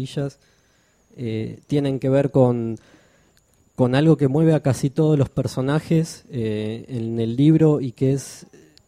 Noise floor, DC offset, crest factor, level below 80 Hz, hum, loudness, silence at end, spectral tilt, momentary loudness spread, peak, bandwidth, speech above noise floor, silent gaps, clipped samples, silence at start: -61 dBFS; under 0.1%; 18 dB; -52 dBFS; none; -21 LUFS; 0.5 s; -7.5 dB/octave; 12 LU; -4 dBFS; 13.5 kHz; 41 dB; none; under 0.1%; 0 s